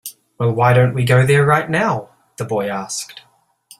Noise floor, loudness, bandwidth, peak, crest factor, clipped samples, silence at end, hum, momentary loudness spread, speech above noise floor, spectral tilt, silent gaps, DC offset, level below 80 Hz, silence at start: -49 dBFS; -16 LUFS; 14.5 kHz; 0 dBFS; 16 dB; under 0.1%; 0.6 s; none; 14 LU; 33 dB; -6 dB/octave; none; under 0.1%; -50 dBFS; 0.05 s